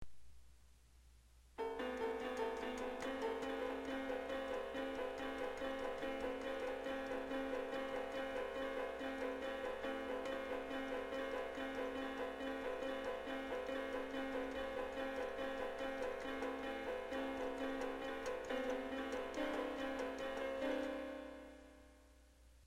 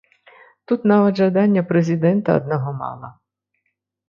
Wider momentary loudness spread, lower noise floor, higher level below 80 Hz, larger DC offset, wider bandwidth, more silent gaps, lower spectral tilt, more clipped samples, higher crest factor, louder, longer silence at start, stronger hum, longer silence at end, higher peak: second, 2 LU vs 13 LU; second, -66 dBFS vs -74 dBFS; about the same, -64 dBFS vs -60 dBFS; neither; first, 16 kHz vs 6.8 kHz; neither; second, -4.5 dB/octave vs -9 dB/octave; neither; about the same, 14 dB vs 16 dB; second, -44 LUFS vs -18 LUFS; second, 0 s vs 0.7 s; second, none vs 50 Hz at -40 dBFS; second, 0 s vs 1 s; second, -30 dBFS vs -2 dBFS